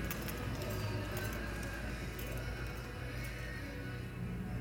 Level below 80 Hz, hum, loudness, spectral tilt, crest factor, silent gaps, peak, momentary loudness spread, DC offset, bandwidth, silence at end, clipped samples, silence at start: -46 dBFS; none; -42 LUFS; -5.5 dB/octave; 18 dB; none; -22 dBFS; 4 LU; under 0.1%; over 20 kHz; 0 s; under 0.1%; 0 s